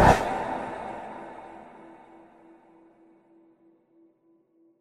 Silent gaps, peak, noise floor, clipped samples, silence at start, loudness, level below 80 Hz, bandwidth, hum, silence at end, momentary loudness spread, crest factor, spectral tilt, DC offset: none; -4 dBFS; -65 dBFS; under 0.1%; 0 s; -29 LUFS; -44 dBFS; 15.5 kHz; none; 2.85 s; 27 LU; 26 dB; -6 dB/octave; under 0.1%